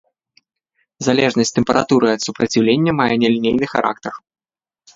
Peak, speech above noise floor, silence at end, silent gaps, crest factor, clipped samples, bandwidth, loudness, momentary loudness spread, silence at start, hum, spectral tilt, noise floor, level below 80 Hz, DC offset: 0 dBFS; 47 dB; 0.8 s; none; 18 dB; under 0.1%; 7.8 kHz; -16 LUFS; 8 LU; 1 s; none; -5 dB/octave; -63 dBFS; -52 dBFS; under 0.1%